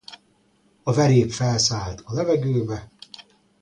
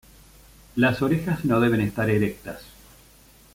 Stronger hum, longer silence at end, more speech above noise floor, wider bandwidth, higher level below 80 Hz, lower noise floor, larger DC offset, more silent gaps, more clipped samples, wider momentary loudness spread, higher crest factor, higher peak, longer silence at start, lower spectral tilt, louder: neither; second, 0.4 s vs 0.9 s; first, 41 dB vs 30 dB; second, 10.5 kHz vs 16.5 kHz; about the same, -48 dBFS vs -50 dBFS; first, -62 dBFS vs -53 dBFS; neither; neither; neither; first, 24 LU vs 17 LU; about the same, 18 dB vs 18 dB; about the same, -4 dBFS vs -6 dBFS; second, 0.1 s vs 0.75 s; second, -5 dB/octave vs -7 dB/octave; about the same, -22 LUFS vs -23 LUFS